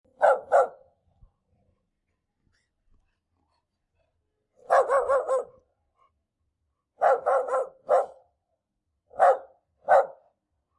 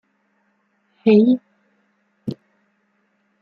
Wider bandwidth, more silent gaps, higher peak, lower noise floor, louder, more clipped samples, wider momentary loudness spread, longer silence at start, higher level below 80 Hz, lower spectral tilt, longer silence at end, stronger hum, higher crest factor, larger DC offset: first, 11.5 kHz vs 5.2 kHz; neither; about the same, -6 dBFS vs -4 dBFS; first, -81 dBFS vs -66 dBFS; second, -24 LUFS vs -18 LUFS; neither; second, 11 LU vs 19 LU; second, 0.2 s vs 1.05 s; about the same, -70 dBFS vs -70 dBFS; second, -3 dB/octave vs -9.5 dB/octave; second, 0.65 s vs 1.1 s; neither; about the same, 22 dB vs 20 dB; neither